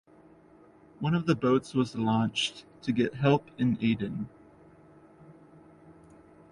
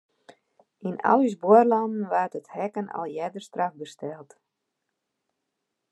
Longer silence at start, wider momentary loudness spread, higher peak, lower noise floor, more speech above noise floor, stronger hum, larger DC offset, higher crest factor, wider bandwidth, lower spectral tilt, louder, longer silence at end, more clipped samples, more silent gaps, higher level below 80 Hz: first, 1 s vs 0.3 s; second, 9 LU vs 19 LU; second, -10 dBFS vs -4 dBFS; second, -57 dBFS vs -81 dBFS; second, 29 dB vs 57 dB; neither; neither; about the same, 20 dB vs 22 dB; about the same, 11 kHz vs 11 kHz; about the same, -6.5 dB/octave vs -7 dB/octave; second, -28 LUFS vs -24 LUFS; second, 0.6 s vs 1.7 s; neither; neither; first, -62 dBFS vs -84 dBFS